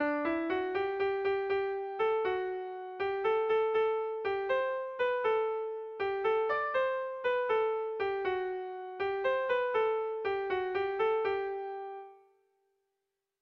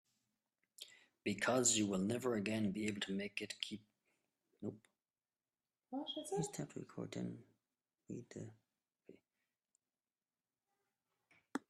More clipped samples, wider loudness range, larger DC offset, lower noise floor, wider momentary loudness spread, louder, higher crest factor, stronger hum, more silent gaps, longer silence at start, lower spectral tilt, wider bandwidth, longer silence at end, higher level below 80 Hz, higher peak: neither; second, 1 LU vs 20 LU; neither; second, -86 dBFS vs under -90 dBFS; second, 8 LU vs 20 LU; first, -32 LUFS vs -41 LUFS; second, 12 dB vs 24 dB; neither; neither; second, 0 s vs 0.8 s; first, -6 dB/octave vs -3.5 dB/octave; second, 6 kHz vs 13.5 kHz; first, 1.25 s vs 0.1 s; first, -70 dBFS vs -80 dBFS; about the same, -20 dBFS vs -20 dBFS